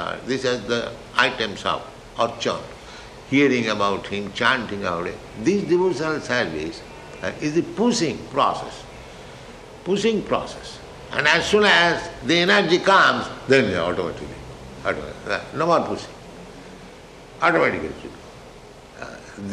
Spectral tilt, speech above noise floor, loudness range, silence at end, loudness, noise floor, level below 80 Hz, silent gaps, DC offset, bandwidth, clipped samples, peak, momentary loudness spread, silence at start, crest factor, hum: -4 dB/octave; 22 dB; 8 LU; 0 s; -21 LUFS; -43 dBFS; -50 dBFS; none; under 0.1%; 12 kHz; under 0.1%; -2 dBFS; 23 LU; 0 s; 22 dB; none